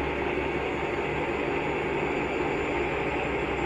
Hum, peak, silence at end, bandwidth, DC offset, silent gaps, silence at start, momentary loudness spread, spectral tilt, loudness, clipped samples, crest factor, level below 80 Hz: none; -16 dBFS; 0 s; 10.5 kHz; under 0.1%; none; 0 s; 1 LU; -6 dB/octave; -28 LUFS; under 0.1%; 12 dB; -44 dBFS